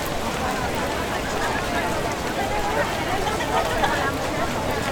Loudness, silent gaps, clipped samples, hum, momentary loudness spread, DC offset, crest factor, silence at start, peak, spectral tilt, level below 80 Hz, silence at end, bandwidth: -24 LUFS; none; under 0.1%; none; 3 LU; under 0.1%; 16 dB; 0 s; -8 dBFS; -4 dB/octave; -38 dBFS; 0 s; over 20 kHz